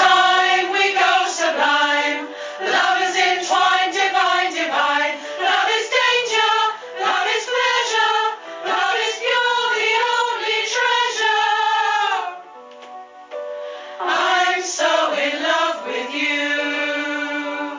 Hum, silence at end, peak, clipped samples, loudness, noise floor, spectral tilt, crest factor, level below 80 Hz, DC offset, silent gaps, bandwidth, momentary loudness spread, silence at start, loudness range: none; 0 s; -2 dBFS; under 0.1%; -18 LUFS; -39 dBFS; 0.5 dB/octave; 18 dB; -78 dBFS; under 0.1%; none; 7.6 kHz; 9 LU; 0 s; 4 LU